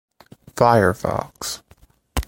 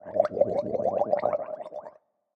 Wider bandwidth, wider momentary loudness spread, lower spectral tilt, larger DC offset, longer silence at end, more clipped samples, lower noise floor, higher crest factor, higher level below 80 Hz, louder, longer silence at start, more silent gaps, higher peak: first, 17 kHz vs 6.4 kHz; first, 17 LU vs 14 LU; second, -5 dB/octave vs -8 dB/octave; neither; second, 0.05 s vs 0.45 s; neither; about the same, -54 dBFS vs -51 dBFS; about the same, 20 dB vs 20 dB; first, -36 dBFS vs -68 dBFS; first, -20 LUFS vs -27 LUFS; first, 0.55 s vs 0.05 s; neither; first, -2 dBFS vs -8 dBFS